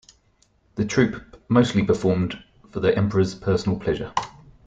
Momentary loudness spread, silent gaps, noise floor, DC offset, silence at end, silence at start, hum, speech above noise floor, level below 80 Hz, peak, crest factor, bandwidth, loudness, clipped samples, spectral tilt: 16 LU; none; -62 dBFS; under 0.1%; 0.35 s; 0.75 s; none; 41 dB; -48 dBFS; -4 dBFS; 18 dB; 9 kHz; -23 LUFS; under 0.1%; -6.5 dB/octave